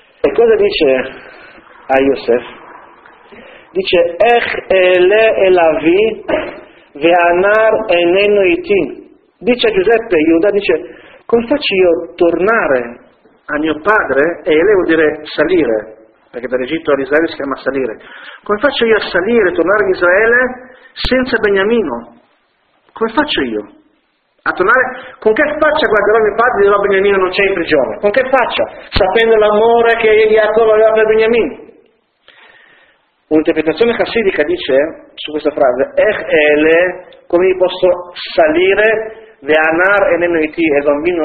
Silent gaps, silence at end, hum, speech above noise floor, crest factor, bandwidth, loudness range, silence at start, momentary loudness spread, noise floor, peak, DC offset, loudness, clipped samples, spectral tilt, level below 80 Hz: none; 0 s; none; 47 dB; 12 dB; 4.8 kHz; 5 LU; 0.25 s; 10 LU; -59 dBFS; 0 dBFS; under 0.1%; -12 LUFS; under 0.1%; -7 dB/octave; -40 dBFS